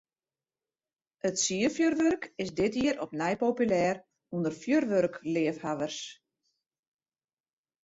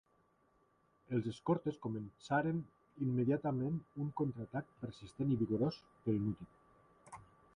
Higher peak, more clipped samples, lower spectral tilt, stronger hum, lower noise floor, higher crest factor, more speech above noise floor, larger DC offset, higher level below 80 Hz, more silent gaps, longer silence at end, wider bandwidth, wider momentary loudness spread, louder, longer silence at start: first, -14 dBFS vs -20 dBFS; neither; second, -4.5 dB/octave vs -8.5 dB/octave; neither; first, under -90 dBFS vs -74 dBFS; about the same, 16 dB vs 18 dB; first, over 61 dB vs 36 dB; neither; about the same, -66 dBFS vs -68 dBFS; neither; first, 1.7 s vs 0.35 s; second, 8 kHz vs 10.5 kHz; second, 9 LU vs 14 LU; first, -30 LUFS vs -39 LUFS; first, 1.25 s vs 1.1 s